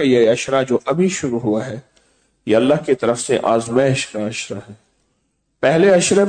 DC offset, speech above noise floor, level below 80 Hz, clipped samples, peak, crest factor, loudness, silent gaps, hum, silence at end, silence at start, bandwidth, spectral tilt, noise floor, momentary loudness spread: under 0.1%; 51 dB; -56 dBFS; under 0.1%; -4 dBFS; 14 dB; -17 LUFS; none; none; 0 s; 0 s; 9.4 kHz; -5 dB/octave; -67 dBFS; 14 LU